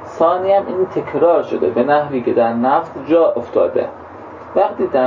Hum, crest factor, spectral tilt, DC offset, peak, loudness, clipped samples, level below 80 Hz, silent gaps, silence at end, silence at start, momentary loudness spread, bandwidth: none; 14 dB; -8 dB/octave; under 0.1%; -2 dBFS; -16 LUFS; under 0.1%; -52 dBFS; none; 0 s; 0 s; 8 LU; 7.2 kHz